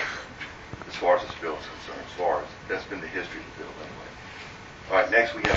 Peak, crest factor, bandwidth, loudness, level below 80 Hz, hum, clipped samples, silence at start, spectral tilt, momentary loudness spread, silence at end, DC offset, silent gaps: -2 dBFS; 26 dB; 7.8 kHz; -28 LUFS; -54 dBFS; none; under 0.1%; 0 s; -4.5 dB/octave; 19 LU; 0 s; under 0.1%; none